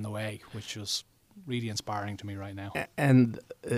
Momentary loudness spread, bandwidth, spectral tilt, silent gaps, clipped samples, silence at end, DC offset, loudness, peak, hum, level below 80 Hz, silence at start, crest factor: 16 LU; 15 kHz; -5.5 dB/octave; none; under 0.1%; 0 s; under 0.1%; -31 LUFS; -10 dBFS; none; -66 dBFS; 0 s; 20 dB